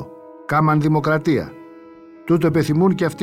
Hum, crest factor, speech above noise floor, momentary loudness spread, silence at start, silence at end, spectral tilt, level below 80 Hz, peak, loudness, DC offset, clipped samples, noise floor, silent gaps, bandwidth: none; 14 dB; 25 dB; 19 LU; 0 s; 0 s; -8 dB/octave; -52 dBFS; -4 dBFS; -18 LUFS; under 0.1%; under 0.1%; -42 dBFS; none; 15.5 kHz